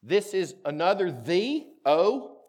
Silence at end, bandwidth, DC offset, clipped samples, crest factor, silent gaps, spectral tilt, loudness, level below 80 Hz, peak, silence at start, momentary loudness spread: 0.15 s; 15 kHz; under 0.1%; under 0.1%; 16 dB; none; -5 dB/octave; -26 LUFS; -88 dBFS; -10 dBFS; 0.05 s; 8 LU